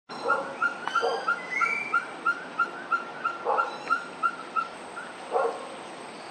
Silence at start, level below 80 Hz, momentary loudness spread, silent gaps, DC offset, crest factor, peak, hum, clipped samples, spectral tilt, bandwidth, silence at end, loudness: 0.1 s; -80 dBFS; 13 LU; none; under 0.1%; 18 dB; -12 dBFS; none; under 0.1%; -3 dB/octave; 10.5 kHz; 0 s; -29 LUFS